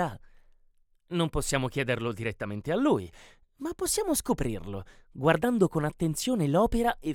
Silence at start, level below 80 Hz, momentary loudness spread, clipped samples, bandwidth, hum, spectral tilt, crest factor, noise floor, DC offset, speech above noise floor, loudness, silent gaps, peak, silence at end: 0 s; -44 dBFS; 13 LU; under 0.1%; 18.5 kHz; none; -5 dB/octave; 20 dB; -64 dBFS; under 0.1%; 36 dB; -28 LUFS; none; -8 dBFS; 0 s